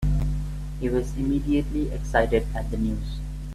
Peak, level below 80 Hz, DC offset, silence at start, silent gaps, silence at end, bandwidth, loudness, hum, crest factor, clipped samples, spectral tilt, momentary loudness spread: -6 dBFS; -30 dBFS; under 0.1%; 0 s; none; 0 s; 13 kHz; -26 LUFS; 50 Hz at -30 dBFS; 18 dB; under 0.1%; -7.5 dB/octave; 9 LU